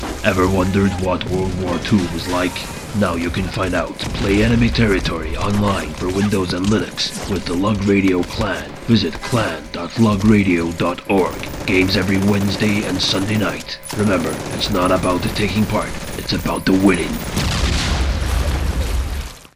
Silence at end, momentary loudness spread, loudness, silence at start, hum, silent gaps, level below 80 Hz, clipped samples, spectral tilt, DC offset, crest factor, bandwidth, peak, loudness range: 0.1 s; 7 LU; -18 LUFS; 0 s; none; none; -28 dBFS; under 0.1%; -5.5 dB/octave; under 0.1%; 16 dB; 16 kHz; 0 dBFS; 2 LU